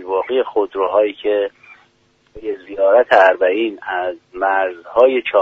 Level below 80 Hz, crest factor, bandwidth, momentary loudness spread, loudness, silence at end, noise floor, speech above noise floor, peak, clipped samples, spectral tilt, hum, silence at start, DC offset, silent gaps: -56 dBFS; 16 dB; 7 kHz; 14 LU; -16 LUFS; 0 s; -58 dBFS; 42 dB; 0 dBFS; under 0.1%; -5 dB/octave; none; 0 s; under 0.1%; none